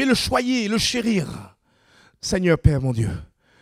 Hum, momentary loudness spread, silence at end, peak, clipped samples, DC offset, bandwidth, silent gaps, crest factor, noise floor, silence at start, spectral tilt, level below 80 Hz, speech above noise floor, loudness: none; 14 LU; 0.35 s; -2 dBFS; under 0.1%; under 0.1%; 15.5 kHz; none; 22 dB; -57 dBFS; 0 s; -5 dB/octave; -38 dBFS; 37 dB; -21 LUFS